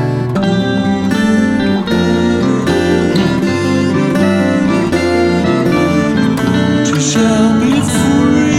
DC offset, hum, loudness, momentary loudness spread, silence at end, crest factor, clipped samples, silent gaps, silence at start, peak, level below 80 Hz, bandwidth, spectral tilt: under 0.1%; none; -12 LUFS; 3 LU; 0 s; 10 dB; under 0.1%; none; 0 s; 0 dBFS; -36 dBFS; 14.5 kHz; -5.5 dB/octave